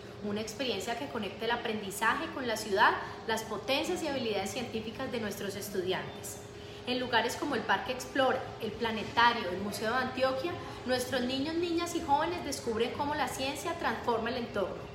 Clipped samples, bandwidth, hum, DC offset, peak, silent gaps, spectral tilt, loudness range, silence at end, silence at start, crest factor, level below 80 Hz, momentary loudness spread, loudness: under 0.1%; 16 kHz; none; under 0.1%; -12 dBFS; none; -3.5 dB/octave; 4 LU; 0 s; 0 s; 20 dB; -58 dBFS; 9 LU; -32 LUFS